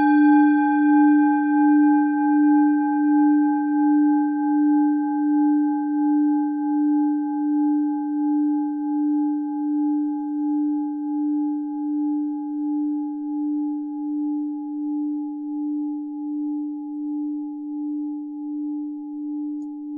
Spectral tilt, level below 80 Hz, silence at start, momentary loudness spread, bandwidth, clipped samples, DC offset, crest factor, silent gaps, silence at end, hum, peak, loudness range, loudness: -9 dB/octave; -76 dBFS; 0 s; 12 LU; 2.6 kHz; under 0.1%; under 0.1%; 14 dB; none; 0 s; none; -8 dBFS; 10 LU; -22 LUFS